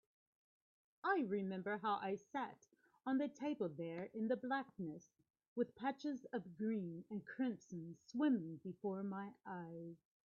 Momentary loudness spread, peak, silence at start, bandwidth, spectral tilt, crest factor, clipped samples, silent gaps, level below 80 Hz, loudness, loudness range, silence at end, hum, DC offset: 11 LU; -26 dBFS; 1.05 s; 7 kHz; -5.5 dB/octave; 18 dB; under 0.1%; 5.30-5.34 s, 5.48-5.56 s; -88 dBFS; -44 LUFS; 3 LU; 0.3 s; none; under 0.1%